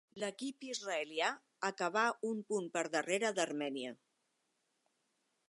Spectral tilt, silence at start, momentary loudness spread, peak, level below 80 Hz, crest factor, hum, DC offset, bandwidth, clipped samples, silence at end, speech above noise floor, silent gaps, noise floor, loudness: -3 dB/octave; 0.15 s; 9 LU; -18 dBFS; under -90 dBFS; 22 dB; none; under 0.1%; 11.5 kHz; under 0.1%; 1.55 s; 44 dB; none; -82 dBFS; -38 LUFS